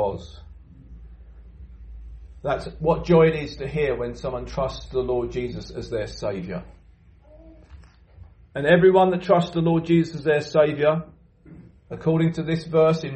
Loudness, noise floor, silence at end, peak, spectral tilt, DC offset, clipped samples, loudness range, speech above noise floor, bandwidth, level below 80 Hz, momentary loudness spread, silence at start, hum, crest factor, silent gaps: -22 LUFS; -52 dBFS; 0 s; -4 dBFS; -7.5 dB/octave; under 0.1%; under 0.1%; 10 LU; 30 dB; 8.6 kHz; -44 dBFS; 17 LU; 0 s; none; 20 dB; none